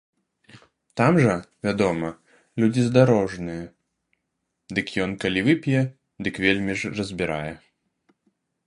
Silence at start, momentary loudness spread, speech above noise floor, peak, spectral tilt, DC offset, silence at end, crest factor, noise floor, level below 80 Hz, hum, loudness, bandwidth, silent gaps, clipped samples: 0.55 s; 15 LU; 56 dB; -2 dBFS; -6.5 dB/octave; under 0.1%; 1.1 s; 22 dB; -78 dBFS; -52 dBFS; none; -23 LUFS; 11 kHz; none; under 0.1%